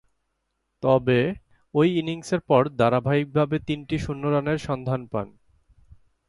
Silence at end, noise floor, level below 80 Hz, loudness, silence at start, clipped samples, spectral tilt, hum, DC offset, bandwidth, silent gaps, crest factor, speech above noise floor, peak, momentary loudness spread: 1 s; -76 dBFS; -52 dBFS; -24 LUFS; 0.8 s; under 0.1%; -7.5 dB/octave; none; under 0.1%; 11.5 kHz; none; 20 dB; 53 dB; -4 dBFS; 9 LU